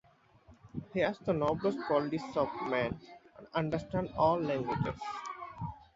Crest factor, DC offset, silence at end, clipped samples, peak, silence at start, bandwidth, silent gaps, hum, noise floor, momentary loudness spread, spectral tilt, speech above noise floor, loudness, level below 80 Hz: 20 dB; under 0.1%; 0.1 s; under 0.1%; -14 dBFS; 0.5 s; 7.6 kHz; none; none; -62 dBFS; 14 LU; -5.5 dB/octave; 29 dB; -34 LUFS; -58 dBFS